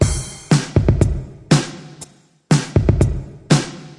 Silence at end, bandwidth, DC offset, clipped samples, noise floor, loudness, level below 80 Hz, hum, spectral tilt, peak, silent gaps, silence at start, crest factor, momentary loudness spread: 0.05 s; 11.5 kHz; under 0.1%; under 0.1%; -42 dBFS; -18 LUFS; -28 dBFS; none; -6 dB/octave; 0 dBFS; none; 0 s; 16 dB; 14 LU